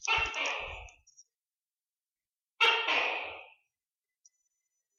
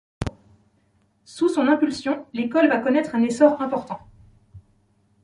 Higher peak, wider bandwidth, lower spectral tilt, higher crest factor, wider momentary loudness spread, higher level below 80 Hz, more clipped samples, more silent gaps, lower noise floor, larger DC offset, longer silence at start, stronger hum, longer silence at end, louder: second, -12 dBFS vs -4 dBFS; first, 13 kHz vs 11.5 kHz; second, -0.5 dB/octave vs -6 dB/octave; about the same, 22 dB vs 20 dB; first, 18 LU vs 15 LU; second, -60 dBFS vs -50 dBFS; neither; first, 1.57-1.61 s, 2.41-2.45 s vs none; first, under -90 dBFS vs -64 dBFS; neither; second, 0 s vs 0.2 s; neither; first, 1.5 s vs 0.65 s; second, -29 LUFS vs -21 LUFS